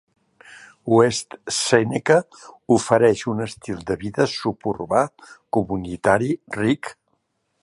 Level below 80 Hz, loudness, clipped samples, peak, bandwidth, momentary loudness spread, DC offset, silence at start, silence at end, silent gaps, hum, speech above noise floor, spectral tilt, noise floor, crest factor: -52 dBFS; -21 LUFS; under 0.1%; -2 dBFS; 11.5 kHz; 11 LU; under 0.1%; 0.5 s; 0.7 s; none; none; 50 dB; -5 dB/octave; -71 dBFS; 20 dB